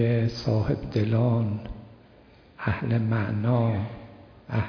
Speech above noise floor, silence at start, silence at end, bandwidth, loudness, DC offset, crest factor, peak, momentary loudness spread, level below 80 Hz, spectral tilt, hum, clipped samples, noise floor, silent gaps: 29 dB; 0 s; 0 s; 5.4 kHz; -26 LUFS; under 0.1%; 14 dB; -12 dBFS; 12 LU; -48 dBFS; -9 dB/octave; none; under 0.1%; -53 dBFS; none